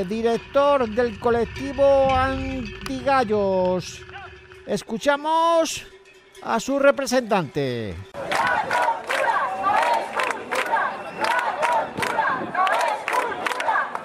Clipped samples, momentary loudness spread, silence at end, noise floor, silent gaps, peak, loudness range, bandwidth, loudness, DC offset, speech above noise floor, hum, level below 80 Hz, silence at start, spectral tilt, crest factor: under 0.1%; 11 LU; 0 s; -47 dBFS; none; -6 dBFS; 2 LU; 16 kHz; -22 LUFS; under 0.1%; 26 dB; none; -46 dBFS; 0 s; -4.5 dB/octave; 18 dB